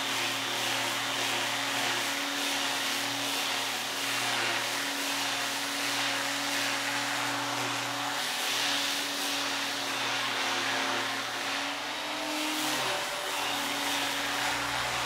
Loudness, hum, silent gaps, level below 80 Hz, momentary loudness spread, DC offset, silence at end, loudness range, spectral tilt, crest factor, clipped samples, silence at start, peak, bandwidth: -29 LUFS; none; none; -68 dBFS; 3 LU; under 0.1%; 0 s; 1 LU; -1 dB/octave; 16 dB; under 0.1%; 0 s; -16 dBFS; 16 kHz